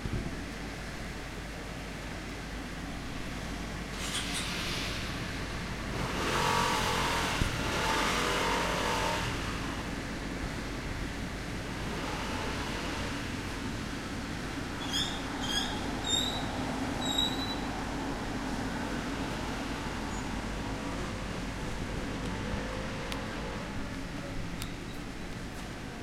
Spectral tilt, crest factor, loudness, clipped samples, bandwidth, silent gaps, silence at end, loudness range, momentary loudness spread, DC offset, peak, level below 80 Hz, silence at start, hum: -4 dB/octave; 20 dB; -34 LUFS; under 0.1%; 16.5 kHz; none; 0 s; 8 LU; 11 LU; under 0.1%; -14 dBFS; -44 dBFS; 0 s; none